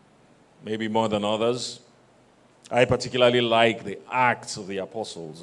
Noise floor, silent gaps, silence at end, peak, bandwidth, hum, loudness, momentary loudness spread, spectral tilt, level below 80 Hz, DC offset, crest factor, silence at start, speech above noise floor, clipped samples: -57 dBFS; none; 0 s; -2 dBFS; 11.5 kHz; none; -24 LUFS; 14 LU; -4.5 dB/octave; -60 dBFS; under 0.1%; 22 dB; 0.65 s; 33 dB; under 0.1%